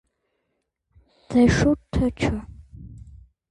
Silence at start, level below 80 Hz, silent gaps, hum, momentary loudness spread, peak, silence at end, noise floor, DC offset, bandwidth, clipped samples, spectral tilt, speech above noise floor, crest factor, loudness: 1.3 s; -36 dBFS; none; none; 26 LU; -6 dBFS; 0.5 s; -77 dBFS; under 0.1%; 11 kHz; under 0.1%; -6.5 dB/octave; 56 dB; 18 dB; -22 LUFS